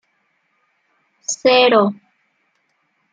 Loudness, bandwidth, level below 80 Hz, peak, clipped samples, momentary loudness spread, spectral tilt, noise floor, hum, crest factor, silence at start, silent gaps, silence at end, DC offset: -15 LUFS; 9.4 kHz; -72 dBFS; -2 dBFS; under 0.1%; 18 LU; -3 dB/octave; -66 dBFS; none; 18 dB; 1.3 s; none; 1.2 s; under 0.1%